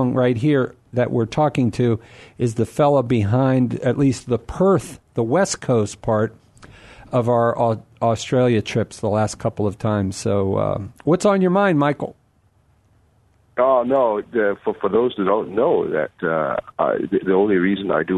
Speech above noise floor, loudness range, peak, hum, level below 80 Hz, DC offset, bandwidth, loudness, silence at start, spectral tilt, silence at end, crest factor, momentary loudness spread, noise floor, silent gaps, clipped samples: 40 dB; 2 LU; -4 dBFS; none; -50 dBFS; under 0.1%; 12 kHz; -20 LUFS; 0 s; -6.5 dB/octave; 0 s; 14 dB; 7 LU; -59 dBFS; none; under 0.1%